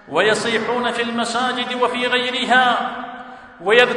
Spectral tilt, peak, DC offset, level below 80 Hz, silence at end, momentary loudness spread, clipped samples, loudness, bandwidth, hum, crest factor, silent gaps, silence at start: -3 dB/octave; 0 dBFS; under 0.1%; -60 dBFS; 0 s; 14 LU; under 0.1%; -18 LUFS; 11.5 kHz; none; 18 dB; none; 0.05 s